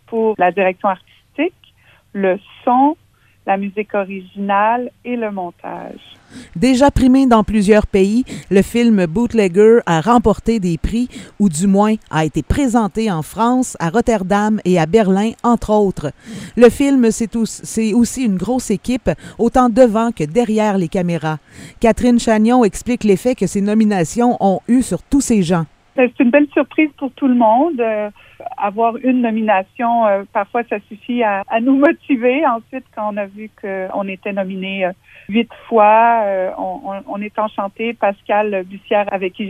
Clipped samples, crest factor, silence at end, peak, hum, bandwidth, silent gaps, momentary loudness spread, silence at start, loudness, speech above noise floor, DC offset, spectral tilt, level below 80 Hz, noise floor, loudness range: under 0.1%; 16 dB; 0 s; 0 dBFS; none; 15.5 kHz; none; 12 LU; 0.1 s; -16 LUFS; 36 dB; under 0.1%; -6 dB/octave; -36 dBFS; -51 dBFS; 5 LU